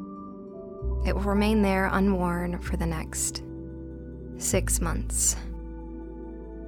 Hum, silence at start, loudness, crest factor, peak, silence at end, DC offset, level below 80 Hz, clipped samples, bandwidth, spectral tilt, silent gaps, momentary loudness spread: none; 0 s; -26 LUFS; 16 dB; -12 dBFS; 0 s; under 0.1%; -34 dBFS; under 0.1%; 19 kHz; -4.5 dB/octave; none; 17 LU